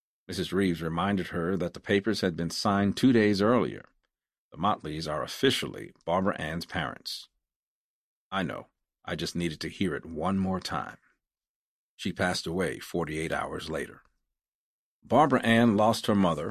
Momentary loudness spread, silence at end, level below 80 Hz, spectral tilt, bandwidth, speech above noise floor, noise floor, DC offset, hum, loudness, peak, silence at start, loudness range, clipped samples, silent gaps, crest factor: 13 LU; 0 s; -54 dBFS; -5.5 dB/octave; 14 kHz; over 62 dB; under -90 dBFS; under 0.1%; none; -28 LUFS; -8 dBFS; 0.3 s; 7 LU; under 0.1%; 4.38-4.51 s, 7.56-8.31 s, 11.49-11.98 s, 14.48-15.02 s; 20 dB